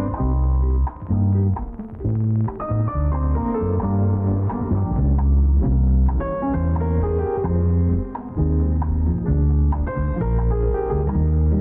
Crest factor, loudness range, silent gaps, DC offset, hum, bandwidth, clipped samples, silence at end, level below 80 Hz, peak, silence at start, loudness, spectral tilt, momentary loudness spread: 8 dB; 2 LU; none; under 0.1%; none; 2.5 kHz; under 0.1%; 0 s; -22 dBFS; -10 dBFS; 0 s; -21 LUFS; -14.5 dB/octave; 5 LU